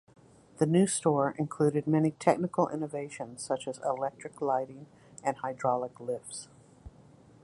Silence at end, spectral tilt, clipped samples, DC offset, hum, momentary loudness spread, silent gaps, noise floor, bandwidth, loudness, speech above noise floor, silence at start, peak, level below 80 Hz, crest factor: 0.55 s; -6 dB/octave; under 0.1%; under 0.1%; none; 13 LU; none; -57 dBFS; 11.5 kHz; -30 LUFS; 27 dB; 0.6 s; -10 dBFS; -66 dBFS; 22 dB